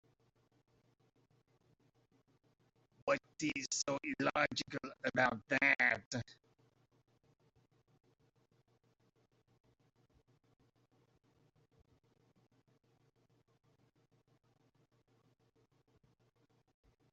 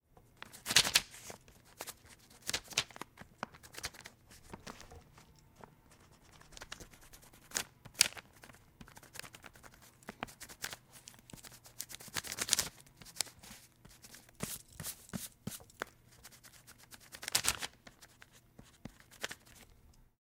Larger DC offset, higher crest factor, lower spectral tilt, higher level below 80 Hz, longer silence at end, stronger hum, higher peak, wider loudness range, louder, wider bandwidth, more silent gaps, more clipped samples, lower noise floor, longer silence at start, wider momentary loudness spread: neither; second, 28 dB vs 40 dB; first, -2 dB/octave vs -0.5 dB/octave; second, -78 dBFS vs -66 dBFS; first, 10.8 s vs 0.3 s; neither; second, -16 dBFS vs -2 dBFS; about the same, 12 LU vs 12 LU; about the same, -36 LUFS vs -37 LUFS; second, 8 kHz vs 18 kHz; first, 6.06-6.11 s vs none; neither; first, -76 dBFS vs -63 dBFS; first, 3.05 s vs 0.45 s; second, 14 LU vs 26 LU